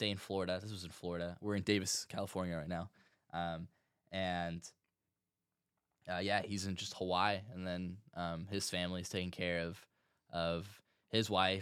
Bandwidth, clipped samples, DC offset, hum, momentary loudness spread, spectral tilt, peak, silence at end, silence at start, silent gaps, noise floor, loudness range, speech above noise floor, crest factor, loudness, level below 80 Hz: 16 kHz; under 0.1%; under 0.1%; none; 12 LU; -4 dB/octave; -16 dBFS; 0 s; 0 s; none; under -90 dBFS; 5 LU; over 51 dB; 24 dB; -39 LUFS; -66 dBFS